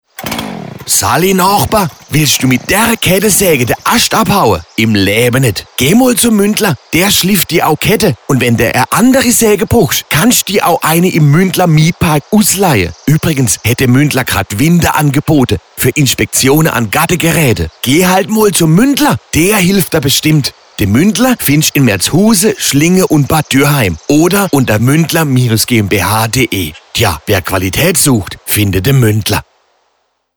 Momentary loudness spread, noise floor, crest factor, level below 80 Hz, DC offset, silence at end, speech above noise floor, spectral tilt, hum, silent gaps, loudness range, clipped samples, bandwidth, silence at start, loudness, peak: 5 LU; -60 dBFS; 10 dB; -34 dBFS; under 0.1%; 0.95 s; 51 dB; -4.5 dB/octave; none; none; 2 LU; under 0.1%; over 20 kHz; 0.2 s; -9 LUFS; 0 dBFS